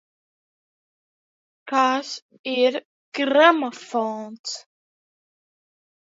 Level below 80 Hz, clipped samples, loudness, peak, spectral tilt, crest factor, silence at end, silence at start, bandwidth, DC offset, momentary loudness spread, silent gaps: -84 dBFS; under 0.1%; -21 LUFS; 0 dBFS; -2.5 dB/octave; 24 dB; 1.5 s; 1.65 s; 7.8 kHz; under 0.1%; 18 LU; 2.22-2.29 s, 2.39-2.44 s, 2.85-3.12 s, 4.39-4.44 s